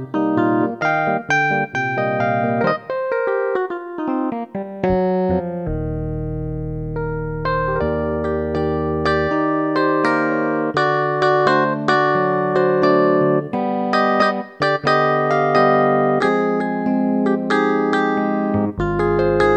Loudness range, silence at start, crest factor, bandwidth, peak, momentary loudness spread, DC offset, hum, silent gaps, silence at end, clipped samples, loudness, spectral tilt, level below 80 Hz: 6 LU; 0 s; 16 dB; 8.8 kHz; -2 dBFS; 9 LU; under 0.1%; none; none; 0 s; under 0.1%; -18 LUFS; -7.5 dB/octave; -38 dBFS